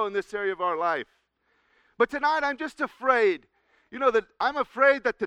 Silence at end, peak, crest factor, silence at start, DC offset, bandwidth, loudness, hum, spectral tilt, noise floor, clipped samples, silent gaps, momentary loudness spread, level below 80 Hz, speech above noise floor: 0 s; -6 dBFS; 20 dB; 0 s; under 0.1%; 10.5 kHz; -25 LUFS; none; -4 dB/octave; -70 dBFS; under 0.1%; none; 10 LU; -64 dBFS; 45 dB